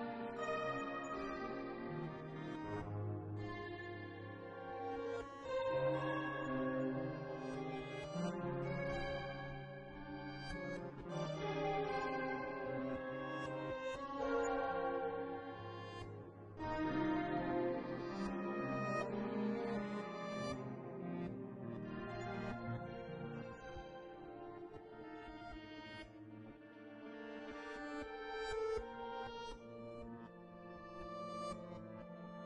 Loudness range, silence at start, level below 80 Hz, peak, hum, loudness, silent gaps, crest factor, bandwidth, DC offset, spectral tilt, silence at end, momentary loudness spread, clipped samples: 9 LU; 0 s; -64 dBFS; -26 dBFS; none; -44 LUFS; none; 16 dB; 10.5 kHz; under 0.1%; -6.5 dB/octave; 0 s; 13 LU; under 0.1%